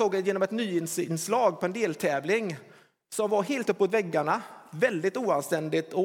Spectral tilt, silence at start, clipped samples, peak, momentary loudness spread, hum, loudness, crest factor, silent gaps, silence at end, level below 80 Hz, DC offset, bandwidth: -5 dB/octave; 0 s; under 0.1%; -10 dBFS; 6 LU; none; -28 LUFS; 18 dB; none; 0 s; -82 dBFS; under 0.1%; 18 kHz